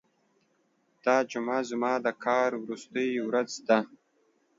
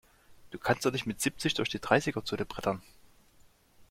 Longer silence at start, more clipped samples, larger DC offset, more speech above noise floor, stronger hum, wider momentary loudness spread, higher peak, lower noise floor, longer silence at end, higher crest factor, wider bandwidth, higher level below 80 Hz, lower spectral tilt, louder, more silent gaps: first, 1.05 s vs 0.3 s; neither; neither; first, 43 dB vs 30 dB; neither; about the same, 6 LU vs 8 LU; about the same, -10 dBFS vs -8 dBFS; first, -71 dBFS vs -62 dBFS; first, 0.7 s vs 0.05 s; about the same, 20 dB vs 24 dB; second, 7.8 kHz vs 16.5 kHz; second, -80 dBFS vs -58 dBFS; about the same, -4.5 dB/octave vs -4 dB/octave; about the same, -29 LUFS vs -31 LUFS; neither